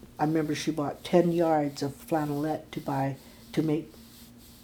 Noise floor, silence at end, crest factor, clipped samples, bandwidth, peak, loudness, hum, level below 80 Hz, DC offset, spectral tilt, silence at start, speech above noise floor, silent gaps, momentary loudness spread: -51 dBFS; 0.1 s; 22 dB; under 0.1%; 20 kHz; -8 dBFS; -29 LUFS; none; -60 dBFS; under 0.1%; -6.5 dB/octave; 0.05 s; 23 dB; none; 10 LU